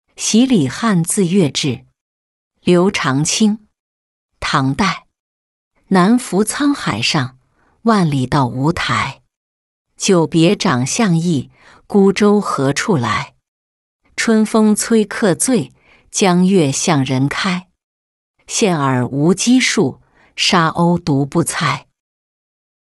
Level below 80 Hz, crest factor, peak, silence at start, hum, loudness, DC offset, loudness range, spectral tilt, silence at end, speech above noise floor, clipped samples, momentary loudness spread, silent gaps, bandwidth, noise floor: -48 dBFS; 14 dB; -2 dBFS; 0.2 s; none; -15 LUFS; under 0.1%; 3 LU; -4.5 dB/octave; 1.1 s; 25 dB; under 0.1%; 8 LU; 2.01-2.51 s, 3.80-4.29 s, 5.20-5.71 s, 9.37-9.85 s, 13.48-14.00 s, 17.83-18.34 s; 12 kHz; -40 dBFS